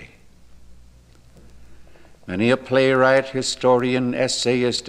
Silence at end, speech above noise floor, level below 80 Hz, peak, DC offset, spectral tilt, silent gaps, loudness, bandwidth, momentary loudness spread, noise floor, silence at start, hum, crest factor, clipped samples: 0 s; 30 dB; -52 dBFS; -4 dBFS; under 0.1%; -4.5 dB/octave; none; -19 LUFS; 11 kHz; 6 LU; -49 dBFS; 0 s; none; 18 dB; under 0.1%